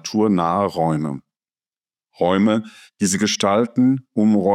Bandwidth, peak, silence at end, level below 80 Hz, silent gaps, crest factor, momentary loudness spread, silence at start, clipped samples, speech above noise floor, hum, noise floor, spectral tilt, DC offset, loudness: 14.5 kHz; -4 dBFS; 0 s; -62 dBFS; none; 16 dB; 7 LU; 0.05 s; under 0.1%; over 72 dB; none; under -90 dBFS; -5 dB/octave; under 0.1%; -19 LUFS